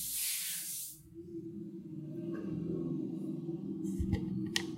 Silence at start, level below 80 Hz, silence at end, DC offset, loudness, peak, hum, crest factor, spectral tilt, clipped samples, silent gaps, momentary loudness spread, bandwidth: 0 s; -54 dBFS; 0 s; under 0.1%; -38 LUFS; -14 dBFS; none; 26 dB; -4 dB/octave; under 0.1%; none; 12 LU; 16 kHz